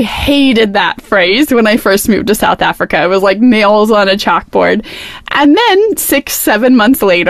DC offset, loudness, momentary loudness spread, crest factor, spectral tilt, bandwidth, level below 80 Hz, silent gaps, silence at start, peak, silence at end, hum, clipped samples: under 0.1%; -9 LUFS; 5 LU; 8 dB; -4 dB/octave; 15.5 kHz; -36 dBFS; none; 0 s; 0 dBFS; 0 s; none; under 0.1%